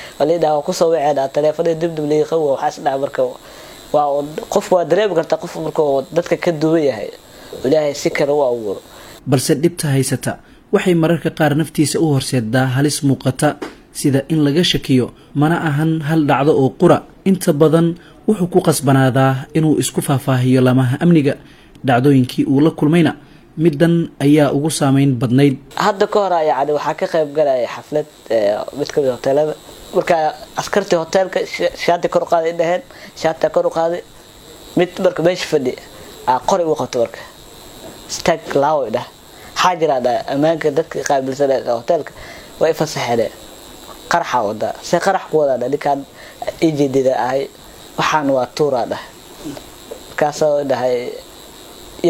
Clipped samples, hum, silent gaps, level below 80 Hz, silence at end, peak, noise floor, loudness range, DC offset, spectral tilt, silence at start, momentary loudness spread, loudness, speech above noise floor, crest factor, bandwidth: under 0.1%; none; none; -48 dBFS; 0 s; 0 dBFS; -40 dBFS; 4 LU; under 0.1%; -6 dB/octave; 0 s; 14 LU; -16 LUFS; 24 dB; 16 dB; 16.5 kHz